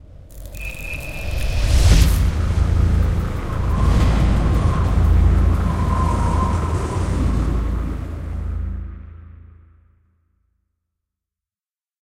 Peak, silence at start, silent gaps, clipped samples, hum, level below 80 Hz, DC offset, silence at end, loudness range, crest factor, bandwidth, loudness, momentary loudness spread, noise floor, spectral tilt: 0 dBFS; 0.1 s; none; under 0.1%; none; -20 dBFS; under 0.1%; 2.7 s; 14 LU; 18 dB; 15.5 kHz; -20 LUFS; 13 LU; under -90 dBFS; -6.5 dB/octave